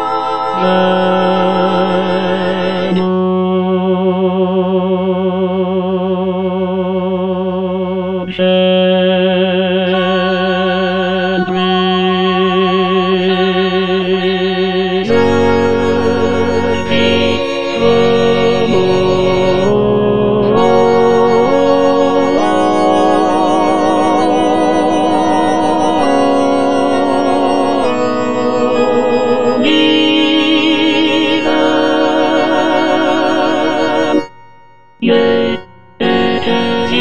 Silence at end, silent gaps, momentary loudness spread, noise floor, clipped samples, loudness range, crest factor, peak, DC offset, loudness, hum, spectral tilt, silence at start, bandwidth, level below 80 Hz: 0 s; none; 5 LU; -44 dBFS; under 0.1%; 3 LU; 12 dB; 0 dBFS; 3%; -12 LUFS; none; -6 dB/octave; 0 s; 10.5 kHz; -44 dBFS